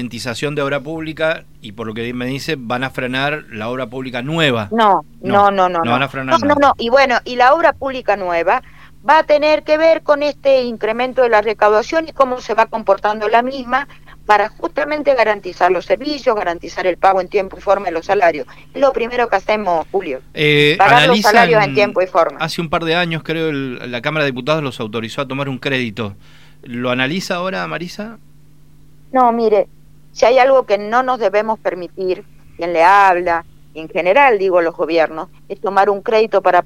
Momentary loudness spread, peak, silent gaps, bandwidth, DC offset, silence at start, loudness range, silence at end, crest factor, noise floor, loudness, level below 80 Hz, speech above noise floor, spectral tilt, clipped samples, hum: 12 LU; 0 dBFS; none; 16 kHz; 0.8%; 0 s; 8 LU; 0 s; 16 dB; -47 dBFS; -15 LUFS; -48 dBFS; 32 dB; -5 dB/octave; under 0.1%; none